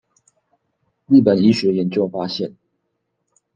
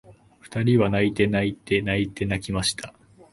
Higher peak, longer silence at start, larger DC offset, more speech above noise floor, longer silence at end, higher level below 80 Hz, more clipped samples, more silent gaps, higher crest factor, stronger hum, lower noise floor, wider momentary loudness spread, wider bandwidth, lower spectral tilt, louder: first, -2 dBFS vs -6 dBFS; first, 1.1 s vs 0.1 s; neither; first, 57 dB vs 25 dB; first, 1.05 s vs 0.45 s; second, -64 dBFS vs -46 dBFS; neither; neither; about the same, 18 dB vs 18 dB; neither; first, -73 dBFS vs -48 dBFS; about the same, 12 LU vs 10 LU; second, 8.6 kHz vs 11.5 kHz; first, -7.5 dB/octave vs -5.5 dB/octave; first, -17 LUFS vs -23 LUFS